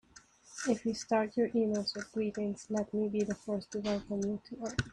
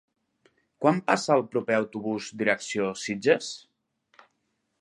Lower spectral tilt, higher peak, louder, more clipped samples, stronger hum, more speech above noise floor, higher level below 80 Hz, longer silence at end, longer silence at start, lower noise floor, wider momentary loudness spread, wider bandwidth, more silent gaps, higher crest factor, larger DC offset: about the same, -5 dB/octave vs -4.5 dB/octave; second, -16 dBFS vs -4 dBFS; second, -35 LUFS vs -26 LUFS; neither; neither; second, 26 dB vs 50 dB; first, -62 dBFS vs -74 dBFS; second, 0 s vs 1.25 s; second, 0.15 s vs 0.8 s; second, -60 dBFS vs -76 dBFS; about the same, 7 LU vs 9 LU; about the same, 10.5 kHz vs 11.5 kHz; neither; second, 18 dB vs 24 dB; neither